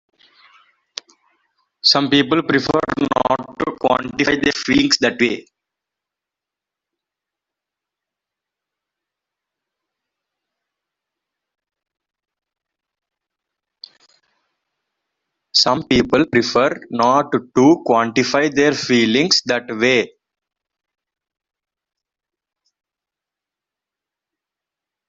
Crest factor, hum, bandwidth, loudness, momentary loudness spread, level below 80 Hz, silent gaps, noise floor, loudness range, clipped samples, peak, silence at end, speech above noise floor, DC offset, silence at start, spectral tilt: 20 dB; none; 7.8 kHz; -16 LUFS; 7 LU; -52 dBFS; none; -87 dBFS; 8 LU; under 0.1%; 0 dBFS; 5.05 s; 71 dB; under 0.1%; 1.85 s; -4 dB/octave